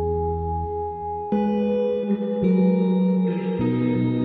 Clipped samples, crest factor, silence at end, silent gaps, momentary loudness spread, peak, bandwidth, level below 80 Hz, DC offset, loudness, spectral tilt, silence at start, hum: under 0.1%; 12 dB; 0 s; none; 8 LU; -10 dBFS; 4.4 kHz; -44 dBFS; under 0.1%; -23 LUFS; -11.5 dB/octave; 0 s; none